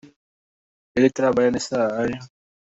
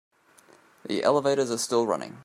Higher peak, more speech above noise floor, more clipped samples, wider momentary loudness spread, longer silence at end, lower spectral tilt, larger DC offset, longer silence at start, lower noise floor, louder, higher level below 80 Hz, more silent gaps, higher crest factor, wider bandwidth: first, -4 dBFS vs -8 dBFS; first, over 70 dB vs 32 dB; neither; about the same, 9 LU vs 8 LU; first, 0.4 s vs 0 s; first, -5.5 dB/octave vs -4 dB/octave; neither; about the same, 0.95 s vs 0.85 s; first, under -90 dBFS vs -58 dBFS; first, -21 LUFS vs -25 LUFS; first, -56 dBFS vs -74 dBFS; neither; about the same, 18 dB vs 20 dB; second, 8 kHz vs 14.5 kHz